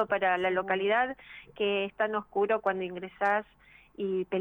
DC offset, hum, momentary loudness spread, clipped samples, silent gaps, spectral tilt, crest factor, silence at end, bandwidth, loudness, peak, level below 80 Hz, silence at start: under 0.1%; none; 9 LU; under 0.1%; none; -6.5 dB/octave; 16 dB; 0 s; 5 kHz; -30 LUFS; -14 dBFS; -66 dBFS; 0 s